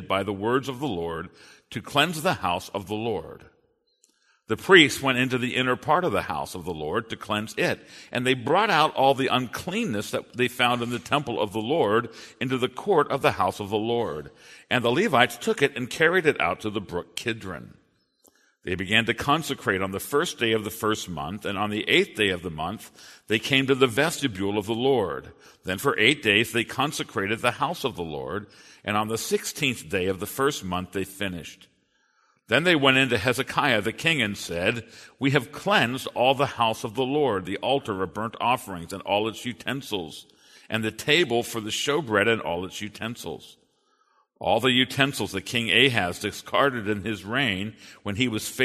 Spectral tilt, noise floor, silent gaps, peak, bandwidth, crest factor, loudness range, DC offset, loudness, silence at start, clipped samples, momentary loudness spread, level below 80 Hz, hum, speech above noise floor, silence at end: -4 dB/octave; -67 dBFS; none; 0 dBFS; 13.5 kHz; 24 dB; 5 LU; under 0.1%; -24 LUFS; 0 s; under 0.1%; 13 LU; -58 dBFS; none; 42 dB; 0 s